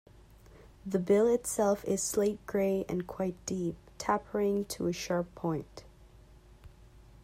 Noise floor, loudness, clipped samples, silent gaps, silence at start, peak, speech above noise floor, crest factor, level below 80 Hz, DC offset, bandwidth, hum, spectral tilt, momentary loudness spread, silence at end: -56 dBFS; -32 LUFS; under 0.1%; none; 0.55 s; -14 dBFS; 25 dB; 18 dB; -58 dBFS; under 0.1%; 16 kHz; none; -5 dB/octave; 10 LU; 0.25 s